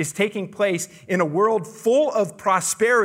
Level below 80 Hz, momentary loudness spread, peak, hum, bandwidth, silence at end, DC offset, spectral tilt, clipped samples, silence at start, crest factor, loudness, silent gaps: -72 dBFS; 5 LU; -6 dBFS; none; 16 kHz; 0 s; under 0.1%; -4 dB/octave; under 0.1%; 0 s; 16 dB; -21 LUFS; none